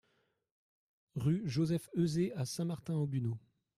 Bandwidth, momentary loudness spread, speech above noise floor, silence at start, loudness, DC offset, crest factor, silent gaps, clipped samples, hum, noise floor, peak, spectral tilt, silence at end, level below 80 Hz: 14.5 kHz; 6 LU; 43 dB; 1.15 s; -36 LUFS; under 0.1%; 16 dB; none; under 0.1%; none; -78 dBFS; -22 dBFS; -7 dB/octave; 0.4 s; -68 dBFS